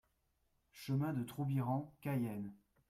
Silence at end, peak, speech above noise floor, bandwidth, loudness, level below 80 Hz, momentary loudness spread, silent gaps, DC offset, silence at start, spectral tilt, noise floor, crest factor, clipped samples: 0.35 s; -26 dBFS; 41 dB; 15.5 kHz; -40 LUFS; -74 dBFS; 10 LU; none; under 0.1%; 0.75 s; -8 dB/octave; -80 dBFS; 14 dB; under 0.1%